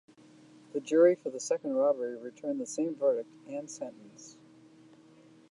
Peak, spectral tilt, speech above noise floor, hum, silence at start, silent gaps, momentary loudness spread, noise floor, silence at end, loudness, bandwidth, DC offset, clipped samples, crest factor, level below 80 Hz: -12 dBFS; -4.5 dB/octave; 28 dB; none; 0.75 s; none; 21 LU; -58 dBFS; 1.2 s; -31 LUFS; 11 kHz; under 0.1%; under 0.1%; 20 dB; -88 dBFS